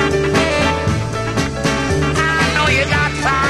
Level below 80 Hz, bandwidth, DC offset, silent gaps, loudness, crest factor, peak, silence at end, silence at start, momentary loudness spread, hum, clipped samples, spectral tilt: -28 dBFS; 13 kHz; 0.6%; none; -16 LUFS; 14 dB; -2 dBFS; 0 s; 0 s; 5 LU; none; under 0.1%; -4.5 dB/octave